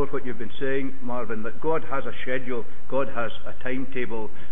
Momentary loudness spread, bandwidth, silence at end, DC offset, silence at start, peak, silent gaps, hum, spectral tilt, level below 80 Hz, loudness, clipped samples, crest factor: 6 LU; 3.8 kHz; 0 s; 20%; 0 s; -10 dBFS; none; none; -10.5 dB/octave; -52 dBFS; -30 LUFS; under 0.1%; 16 dB